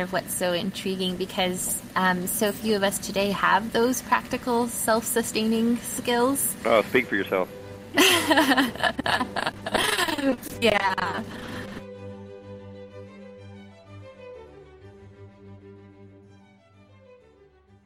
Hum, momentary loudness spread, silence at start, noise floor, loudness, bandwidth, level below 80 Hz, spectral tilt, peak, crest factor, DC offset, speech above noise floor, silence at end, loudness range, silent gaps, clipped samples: none; 22 LU; 0 s; -56 dBFS; -24 LUFS; 16 kHz; -54 dBFS; -3 dB/octave; -6 dBFS; 20 dB; under 0.1%; 32 dB; 1.65 s; 19 LU; none; under 0.1%